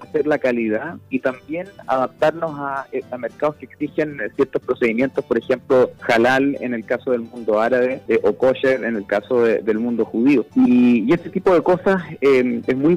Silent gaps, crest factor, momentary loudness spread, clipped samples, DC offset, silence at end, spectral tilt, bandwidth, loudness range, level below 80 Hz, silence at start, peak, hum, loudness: none; 10 dB; 10 LU; under 0.1%; under 0.1%; 0 s; -7 dB/octave; 10.5 kHz; 6 LU; -56 dBFS; 0 s; -8 dBFS; none; -19 LUFS